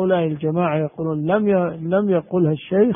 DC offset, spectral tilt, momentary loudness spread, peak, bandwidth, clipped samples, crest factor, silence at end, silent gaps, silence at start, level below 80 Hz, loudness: under 0.1%; -13 dB/octave; 4 LU; -4 dBFS; 3.7 kHz; under 0.1%; 14 dB; 0 s; none; 0 s; -58 dBFS; -20 LUFS